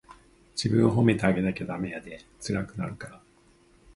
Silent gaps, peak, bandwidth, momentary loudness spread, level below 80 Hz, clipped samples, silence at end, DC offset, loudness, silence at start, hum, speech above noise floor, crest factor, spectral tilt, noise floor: none; -6 dBFS; 11.5 kHz; 18 LU; -54 dBFS; under 0.1%; 0.8 s; under 0.1%; -27 LUFS; 0.1 s; none; 33 dB; 22 dB; -6.5 dB/octave; -60 dBFS